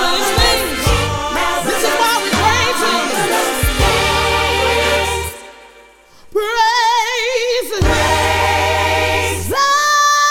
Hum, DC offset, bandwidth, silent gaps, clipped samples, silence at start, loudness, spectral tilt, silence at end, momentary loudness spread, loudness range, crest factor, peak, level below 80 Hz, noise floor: none; under 0.1%; 18.5 kHz; none; under 0.1%; 0 s; -14 LUFS; -3 dB/octave; 0 s; 5 LU; 2 LU; 14 dB; 0 dBFS; -28 dBFS; -44 dBFS